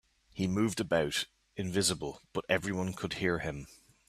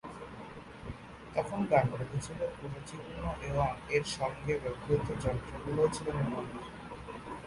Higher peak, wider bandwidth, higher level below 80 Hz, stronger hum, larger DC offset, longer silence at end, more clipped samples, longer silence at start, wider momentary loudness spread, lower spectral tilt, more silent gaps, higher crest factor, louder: about the same, -12 dBFS vs -14 dBFS; first, 14.5 kHz vs 11.5 kHz; second, -58 dBFS vs -50 dBFS; neither; neither; first, 0.3 s vs 0 s; neither; first, 0.35 s vs 0.05 s; second, 11 LU vs 16 LU; second, -4 dB/octave vs -6 dB/octave; neither; about the same, 22 dB vs 22 dB; about the same, -33 LUFS vs -34 LUFS